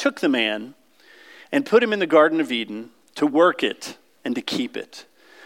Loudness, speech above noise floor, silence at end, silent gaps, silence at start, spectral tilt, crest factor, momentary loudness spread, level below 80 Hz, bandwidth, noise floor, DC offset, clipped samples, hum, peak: -21 LUFS; 31 dB; 0.45 s; none; 0 s; -4.5 dB/octave; 20 dB; 19 LU; -78 dBFS; 16 kHz; -52 dBFS; under 0.1%; under 0.1%; none; -4 dBFS